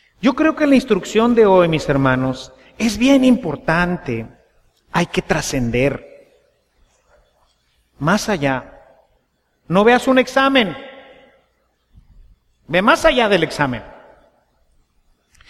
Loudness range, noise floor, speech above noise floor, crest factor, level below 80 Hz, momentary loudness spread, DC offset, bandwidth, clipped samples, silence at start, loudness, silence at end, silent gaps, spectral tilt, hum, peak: 7 LU; -65 dBFS; 49 dB; 18 dB; -42 dBFS; 12 LU; under 0.1%; 14.5 kHz; under 0.1%; 0.2 s; -16 LUFS; 1.6 s; none; -5.5 dB/octave; none; 0 dBFS